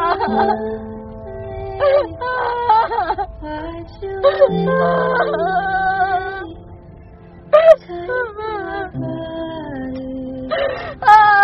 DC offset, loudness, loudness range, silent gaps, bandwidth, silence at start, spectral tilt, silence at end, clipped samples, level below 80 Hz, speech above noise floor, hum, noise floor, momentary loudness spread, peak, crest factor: under 0.1%; -17 LUFS; 3 LU; none; 5.8 kHz; 0 s; -3.5 dB/octave; 0 s; 0.1%; -42 dBFS; 23 dB; none; -40 dBFS; 17 LU; 0 dBFS; 18 dB